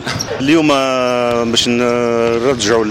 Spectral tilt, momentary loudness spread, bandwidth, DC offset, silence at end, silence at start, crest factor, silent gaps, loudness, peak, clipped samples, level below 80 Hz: -4 dB/octave; 3 LU; 16 kHz; under 0.1%; 0 s; 0 s; 12 dB; none; -14 LUFS; -2 dBFS; under 0.1%; -44 dBFS